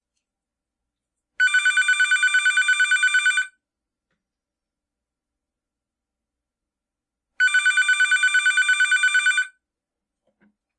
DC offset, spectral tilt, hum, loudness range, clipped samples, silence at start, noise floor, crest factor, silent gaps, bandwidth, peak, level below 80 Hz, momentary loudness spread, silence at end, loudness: under 0.1%; 6.5 dB/octave; none; 7 LU; under 0.1%; 1.4 s; -87 dBFS; 14 dB; none; 11.5 kHz; -10 dBFS; -80 dBFS; 5 LU; 1.3 s; -18 LUFS